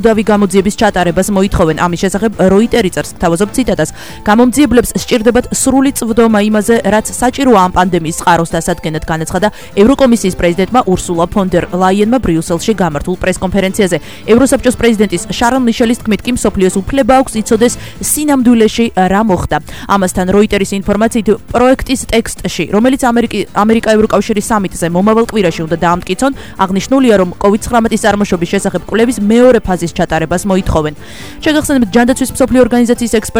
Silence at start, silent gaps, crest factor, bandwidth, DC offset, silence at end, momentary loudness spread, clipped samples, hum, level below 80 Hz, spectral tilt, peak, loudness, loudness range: 0 s; none; 10 dB; over 20 kHz; 2%; 0 s; 6 LU; 0.2%; none; -30 dBFS; -5 dB/octave; 0 dBFS; -11 LUFS; 2 LU